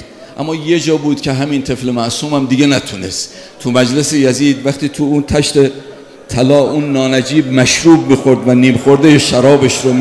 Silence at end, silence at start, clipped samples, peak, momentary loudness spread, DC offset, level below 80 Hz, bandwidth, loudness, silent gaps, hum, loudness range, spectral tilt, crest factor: 0 s; 0 s; 0.4%; 0 dBFS; 11 LU; under 0.1%; -42 dBFS; 11 kHz; -11 LUFS; none; none; 5 LU; -5 dB/octave; 12 dB